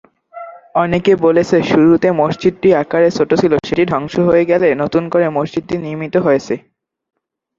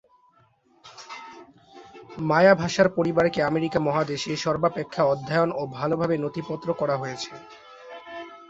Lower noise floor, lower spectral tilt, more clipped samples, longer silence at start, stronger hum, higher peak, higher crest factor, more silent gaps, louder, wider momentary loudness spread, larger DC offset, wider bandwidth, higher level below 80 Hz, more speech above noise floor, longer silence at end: second, -34 dBFS vs -61 dBFS; about the same, -7 dB/octave vs -6 dB/octave; neither; second, 0.35 s vs 0.85 s; neither; first, 0 dBFS vs -4 dBFS; second, 14 dB vs 22 dB; neither; first, -14 LUFS vs -24 LUFS; second, 10 LU vs 22 LU; neither; about the same, 7.6 kHz vs 8 kHz; first, -48 dBFS vs -60 dBFS; second, 21 dB vs 38 dB; first, 1 s vs 0.05 s